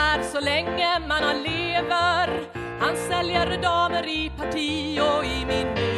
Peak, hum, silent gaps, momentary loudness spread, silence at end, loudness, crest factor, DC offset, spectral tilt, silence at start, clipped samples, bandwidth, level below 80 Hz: -8 dBFS; none; none; 5 LU; 0 s; -24 LUFS; 16 dB; under 0.1%; -4 dB/octave; 0 s; under 0.1%; 13 kHz; -42 dBFS